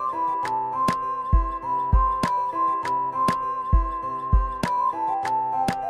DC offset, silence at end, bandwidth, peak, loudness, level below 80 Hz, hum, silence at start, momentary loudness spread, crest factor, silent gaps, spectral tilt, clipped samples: under 0.1%; 0 s; 12.5 kHz; -6 dBFS; -24 LUFS; -28 dBFS; none; 0 s; 4 LU; 16 dB; none; -6.5 dB/octave; under 0.1%